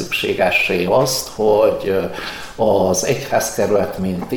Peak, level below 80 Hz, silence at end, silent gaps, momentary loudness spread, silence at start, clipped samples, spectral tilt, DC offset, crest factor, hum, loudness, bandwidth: -4 dBFS; -44 dBFS; 0 s; none; 7 LU; 0 s; under 0.1%; -4 dB/octave; under 0.1%; 14 dB; none; -17 LUFS; 18 kHz